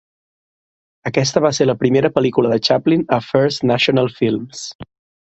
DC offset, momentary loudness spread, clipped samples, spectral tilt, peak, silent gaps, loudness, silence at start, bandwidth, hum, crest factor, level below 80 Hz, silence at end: under 0.1%; 10 LU; under 0.1%; -5.5 dB/octave; 0 dBFS; 4.75-4.79 s; -16 LUFS; 1.05 s; 8.2 kHz; none; 18 dB; -54 dBFS; 0.35 s